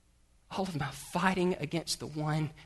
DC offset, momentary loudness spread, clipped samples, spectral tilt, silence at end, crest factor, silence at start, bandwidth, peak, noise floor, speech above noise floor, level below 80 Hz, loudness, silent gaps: under 0.1%; 8 LU; under 0.1%; -5 dB/octave; 0 s; 22 dB; 0.5 s; 12.5 kHz; -12 dBFS; -65 dBFS; 32 dB; -58 dBFS; -33 LUFS; none